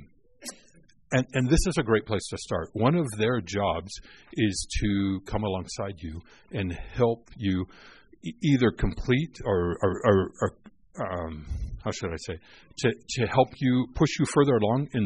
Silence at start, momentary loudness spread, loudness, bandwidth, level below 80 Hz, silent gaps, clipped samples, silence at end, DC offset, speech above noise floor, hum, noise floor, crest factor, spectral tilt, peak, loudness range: 0 s; 16 LU; -27 LUFS; 10.5 kHz; -40 dBFS; none; under 0.1%; 0 s; 0.1%; 33 dB; none; -59 dBFS; 20 dB; -6 dB/octave; -6 dBFS; 4 LU